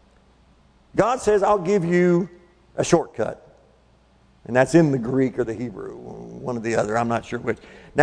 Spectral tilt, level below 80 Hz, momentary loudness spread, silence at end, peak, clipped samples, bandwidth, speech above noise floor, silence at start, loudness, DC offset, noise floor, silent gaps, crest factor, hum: -6.5 dB/octave; -52 dBFS; 16 LU; 0 s; -4 dBFS; under 0.1%; 10.5 kHz; 36 dB; 0.95 s; -22 LUFS; under 0.1%; -57 dBFS; none; 20 dB; none